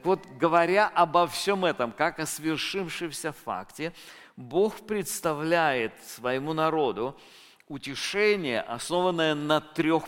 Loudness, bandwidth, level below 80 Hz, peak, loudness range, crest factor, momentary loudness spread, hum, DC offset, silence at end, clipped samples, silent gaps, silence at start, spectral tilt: -27 LUFS; 17 kHz; -62 dBFS; -8 dBFS; 5 LU; 20 dB; 13 LU; none; under 0.1%; 0 s; under 0.1%; none; 0.05 s; -4 dB/octave